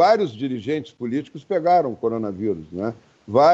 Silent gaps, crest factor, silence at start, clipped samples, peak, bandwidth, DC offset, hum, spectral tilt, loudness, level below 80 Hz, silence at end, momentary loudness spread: none; 16 dB; 0 s; under 0.1%; -4 dBFS; 7.8 kHz; under 0.1%; none; -7 dB/octave; -23 LUFS; -62 dBFS; 0 s; 11 LU